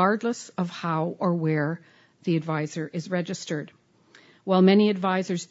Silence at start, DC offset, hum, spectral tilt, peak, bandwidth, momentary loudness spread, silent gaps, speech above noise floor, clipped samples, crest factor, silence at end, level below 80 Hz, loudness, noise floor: 0 s; under 0.1%; none; -6.5 dB/octave; -6 dBFS; 8 kHz; 14 LU; none; 32 dB; under 0.1%; 20 dB; 0.05 s; -74 dBFS; -25 LUFS; -57 dBFS